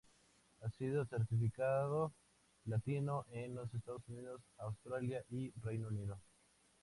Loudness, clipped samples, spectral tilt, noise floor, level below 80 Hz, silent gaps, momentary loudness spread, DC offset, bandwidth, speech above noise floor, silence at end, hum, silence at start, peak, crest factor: -43 LUFS; under 0.1%; -8.5 dB/octave; -73 dBFS; -68 dBFS; none; 12 LU; under 0.1%; 11.5 kHz; 32 dB; 0.6 s; none; 0.6 s; -28 dBFS; 16 dB